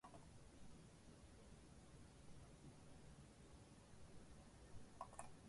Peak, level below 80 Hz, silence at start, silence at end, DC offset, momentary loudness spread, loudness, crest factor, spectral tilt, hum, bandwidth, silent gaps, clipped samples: -38 dBFS; -70 dBFS; 0.05 s; 0 s; under 0.1%; 6 LU; -64 LUFS; 24 dB; -5 dB/octave; none; 11.5 kHz; none; under 0.1%